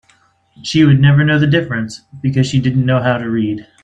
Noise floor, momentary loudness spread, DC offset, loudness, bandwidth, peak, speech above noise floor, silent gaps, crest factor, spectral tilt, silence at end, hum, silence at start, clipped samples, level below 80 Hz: -54 dBFS; 12 LU; under 0.1%; -14 LUFS; 8.8 kHz; 0 dBFS; 41 dB; none; 14 dB; -7 dB/octave; 0.2 s; none; 0.65 s; under 0.1%; -48 dBFS